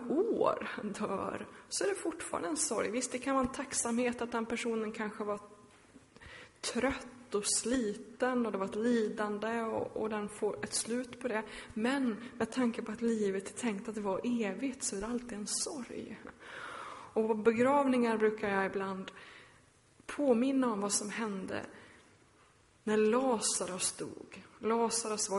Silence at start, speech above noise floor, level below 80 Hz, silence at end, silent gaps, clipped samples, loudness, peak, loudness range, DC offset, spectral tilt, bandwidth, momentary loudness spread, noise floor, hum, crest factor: 0 s; 31 dB; -66 dBFS; 0 s; none; under 0.1%; -34 LUFS; -14 dBFS; 4 LU; under 0.1%; -3.5 dB/octave; 11.5 kHz; 14 LU; -65 dBFS; none; 22 dB